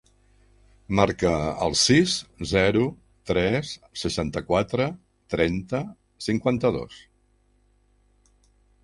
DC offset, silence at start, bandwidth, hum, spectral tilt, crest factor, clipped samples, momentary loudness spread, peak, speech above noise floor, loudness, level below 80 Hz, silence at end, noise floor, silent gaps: under 0.1%; 0.9 s; 11.5 kHz; 50 Hz at -50 dBFS; -4.5 dB/octave; 22 dB; under 0.1%; 13 LU; -4 dBFS; 40 dB; -24 LUFS; -46 dBFS; 1.85 s; -64 dBFS; none